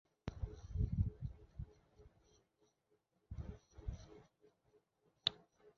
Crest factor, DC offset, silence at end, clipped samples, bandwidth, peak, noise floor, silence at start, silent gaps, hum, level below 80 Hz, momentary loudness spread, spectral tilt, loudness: 30 dB; under 0.1%; 0.05 s; under 0.1%; 7.2 kHz; -16 dBFS; -81 dBFS; 0.25 s; none; none; -52 dBFS; 16 LU; -5 dB/octave; -45 LUFS